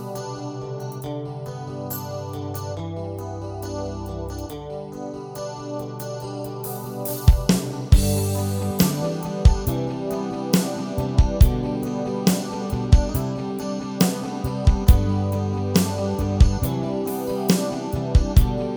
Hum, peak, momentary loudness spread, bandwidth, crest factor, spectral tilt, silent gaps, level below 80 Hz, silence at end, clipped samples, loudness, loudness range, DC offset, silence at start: none; 0 dBFS; 13 LU; over 20 kHz; 20 dB; -6 dB/octave; none; -26 dBFS; 0 s; under 0.1%; -24 LUFS; 10 LU; under 0.1%; 0 s